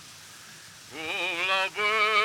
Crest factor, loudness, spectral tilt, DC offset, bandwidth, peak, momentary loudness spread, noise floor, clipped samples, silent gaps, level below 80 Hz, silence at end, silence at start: 18 dB; -26 LUFS; -1 dB/octave; under 0.1%; 19.5 kHz; -12 dBFS; 21 LU; -47 dBFS; under 0.1%; none; -74 dBFS; 0 s; 0 s